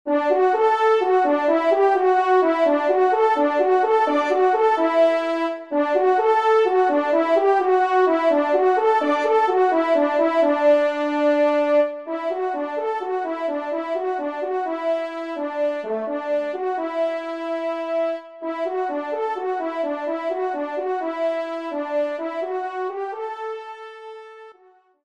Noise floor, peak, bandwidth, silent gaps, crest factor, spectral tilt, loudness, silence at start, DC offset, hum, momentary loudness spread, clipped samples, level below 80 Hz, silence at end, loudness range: -55 dBFS; -6 dBFS; 8.8 kHz; none; 14 dB; -4 dB/octave; -21 LUFS; 0.05 s; under 0.1%; none; 10 LU; under 0.1%; -72 dBFS; 0.5 s; 7 LU